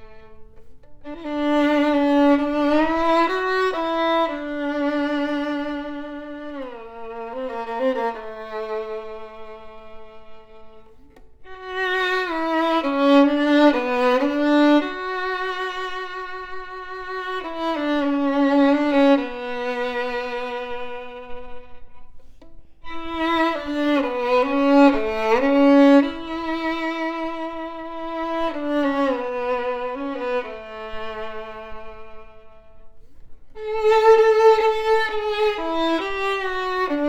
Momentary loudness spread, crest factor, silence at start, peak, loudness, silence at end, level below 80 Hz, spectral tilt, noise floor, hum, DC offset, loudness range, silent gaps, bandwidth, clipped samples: 18 LU; 18 dB; 0 s; -4 dBFS; -21 LUFS; 0 s; -48 dBFS; -4.5 dB/octave; -45 dBFS; none; under 0.1%; 12 LU; none; 8 kHz; under 0.1%